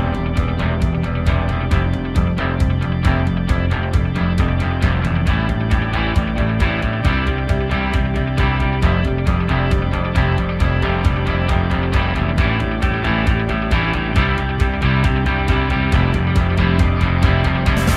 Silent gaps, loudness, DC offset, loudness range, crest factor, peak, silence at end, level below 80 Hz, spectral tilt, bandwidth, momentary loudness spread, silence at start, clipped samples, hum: none; -18 LUFS; under 0.1%; 2 LU; 14 dB; -2 dBFS; 0 s; -22 dBFS; -7 dB/octave; 12.5 kHz; 3 LU; 0 s; under 0.1%; none